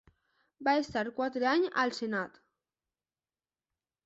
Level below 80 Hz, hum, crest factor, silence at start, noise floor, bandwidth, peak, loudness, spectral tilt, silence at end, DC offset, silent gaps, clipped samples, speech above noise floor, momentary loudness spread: -72 dBFS; none; 20 dB; 0.6 s; under -90 dBFS; 8.2 kHz; -14 dBFS; -31 LUFS; -4.5 dB/octave; 1.75 s; under 0.1%; none; under 0.1%; over 59 dB; 7 LU